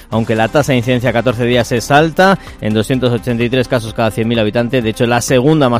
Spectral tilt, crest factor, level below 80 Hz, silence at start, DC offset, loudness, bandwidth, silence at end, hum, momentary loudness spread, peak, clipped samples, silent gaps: -5.5 dB/octave; 12 dB; -36 dBFS; 0 s; under 0.1%; -13 LUFS; 16 kHz; 0 s; none; 5 LU; 0 dBFS; 0.2%; none